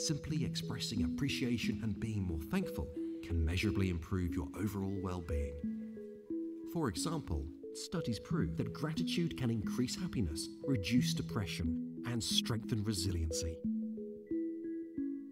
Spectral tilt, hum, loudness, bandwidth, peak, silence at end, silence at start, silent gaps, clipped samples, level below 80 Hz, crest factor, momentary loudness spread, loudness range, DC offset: -5 dB/octave; none; -38 LUFS; 16 kHz; -18 dBFS; 0 s; 0 s; none; under 0.1%; -50 dBFS; 20 dB; 8 LU; 4 LU; under 0.1%